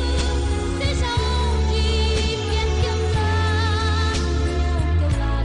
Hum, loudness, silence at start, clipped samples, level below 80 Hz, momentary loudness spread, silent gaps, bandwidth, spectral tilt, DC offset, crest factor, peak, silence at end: none; -21 LUFS; 0 s; under 0.1%; -24 dBFS; 2 LU; none; 10.5 kHz; -5.5 dB/octave; under 0.1%; 12 dB; -8 dBFS; 0 s